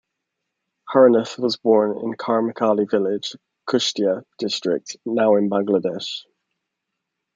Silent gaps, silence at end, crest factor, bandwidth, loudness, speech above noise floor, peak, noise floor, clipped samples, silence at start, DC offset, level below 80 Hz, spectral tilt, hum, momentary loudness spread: none; 1.15 s; 20 dB; 7.6 kHz; -20 LUFS; 61 dB; -2 dBFS; -80 dBFS; under 0.1%; 0.85 s; under 0.1%; -72 dBFS; -5 dB/octave; none; 12 LU